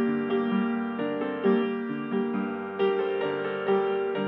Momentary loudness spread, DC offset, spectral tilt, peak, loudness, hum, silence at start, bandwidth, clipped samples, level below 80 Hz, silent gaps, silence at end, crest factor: 5 LU; under 0.1%; -9.5 dB/octave; -12 dBFS; -28 LUFS; none; 0 s; 4.3 kHz; under 0.1%; -84 dBFS; none; 0 s; 16 dB